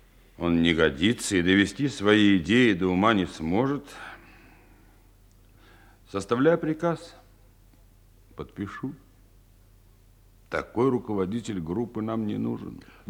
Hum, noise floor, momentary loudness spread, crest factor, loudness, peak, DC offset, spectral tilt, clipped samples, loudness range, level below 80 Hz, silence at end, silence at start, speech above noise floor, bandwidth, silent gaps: none; -56 dBFS; 16 LU; 22 dB; -25 LUFS; -6 dBFS; under 0.1%; -5.5 dB/octave; under 0.1%; 15 LU; -54 dBFS; 0.3 s; 0.4 s; 31 dB; 16.5 kHz; none